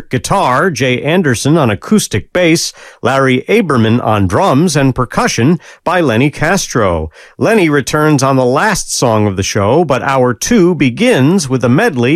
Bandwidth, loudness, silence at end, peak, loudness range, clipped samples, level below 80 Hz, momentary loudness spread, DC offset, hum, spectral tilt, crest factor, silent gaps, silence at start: 16 kHz; -11 LUFS; 0 s; 0 dBFS; 1 LU; under 0.1%; -36 dBFS; 4 LU; under 0.1%; none; -5 dB/octave; 10 dB; none; 0 s